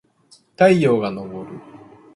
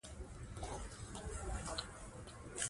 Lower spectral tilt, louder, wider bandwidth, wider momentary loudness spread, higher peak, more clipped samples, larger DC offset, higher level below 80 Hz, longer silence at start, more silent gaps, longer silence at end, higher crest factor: first, -7 dB/octave vs -3 dB/octave; first, -17 LUFS vs -47 LUFS; about the same, 11.5 kHz vs 11.5 kHz; first, 22 LU vs 9 LU; first, -2 dBFS vs -22 dBFS; neither; neither; second, -60 dBFS vs -52 dBFS; first, 0.6 s vs 0.05 s; neither; first, 0.55 s vs 0 s; about the same, 20 dB vs 24 dB